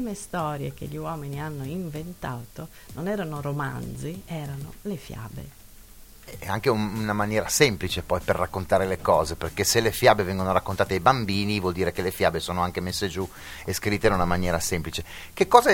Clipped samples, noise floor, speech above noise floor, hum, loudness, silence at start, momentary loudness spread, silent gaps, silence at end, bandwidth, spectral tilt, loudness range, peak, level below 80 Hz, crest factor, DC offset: under 0.1%; -47 dBFS; 21 dB; none; -25 LUFS; 0 s; 15 LU; none; 0 s; 17 kHz; -4.5 dB/octave; 10 LU; 0 dBFS; -46 dBFS; 26 dB; under 0.1%